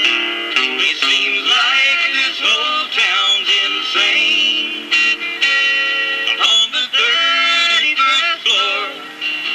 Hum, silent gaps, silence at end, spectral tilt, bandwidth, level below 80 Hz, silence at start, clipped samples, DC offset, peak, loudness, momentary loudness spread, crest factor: none; none; 0 s; 1.5 dB/octave; 12.5 kHz; -74 dBFS; 0 s; under 0.1%; under 0.1%; 0 dBFS; -13 LUFS; 4 LU; 16 dB